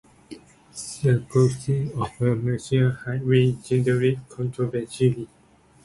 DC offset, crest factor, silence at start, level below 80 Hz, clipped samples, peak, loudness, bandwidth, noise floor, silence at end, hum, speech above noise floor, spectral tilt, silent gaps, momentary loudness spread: under 0.1%; 16 dB; 0.3 s; -52 dBFS; under 0.1%; -6 dBFS; -23 LUFS; 11.5 kHz; -45 dBFS; 0.6 s; none; 23 dB; -7 dB/octave; none; 11 LU